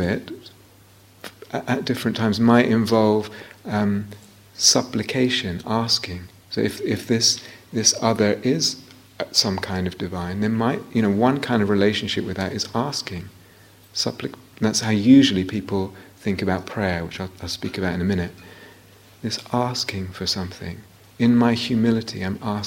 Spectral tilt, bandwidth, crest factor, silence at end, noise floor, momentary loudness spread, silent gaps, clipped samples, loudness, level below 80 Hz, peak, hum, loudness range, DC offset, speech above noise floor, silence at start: -4 dB/octave; 16.5 kHz; 22 dB; 0 s; -51 dBFS; 16 LU; none; under 0.1%; -21 LUFS; -52 dBFS; 0 dBFS; none; 6 LU; under 0.1%; 29 dB; 0 s